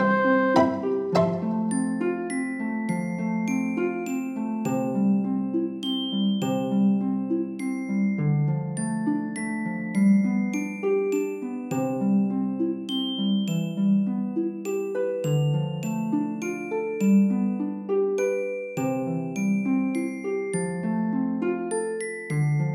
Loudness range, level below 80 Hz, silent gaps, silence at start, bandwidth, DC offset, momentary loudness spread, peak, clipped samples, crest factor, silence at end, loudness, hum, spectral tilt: 2 LU; -66 dBFS; none; 0 s; 14 kHz; under 0.1%; 7 LU; -6 dBFS; under 0.1%; 18 dB; 0 s; -26 LUFS; none; -6.5 dB/octave